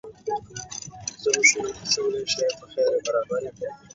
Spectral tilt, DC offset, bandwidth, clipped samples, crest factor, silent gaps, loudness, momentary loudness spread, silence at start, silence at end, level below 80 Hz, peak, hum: -1 dB/octave; under 0.1%; 8 kHz; under 0.1%; 22 dB; none; -24 LUFS; 17 LU; 0.05 s; 0.2 s; -60 dBFS; -4 dBFS; none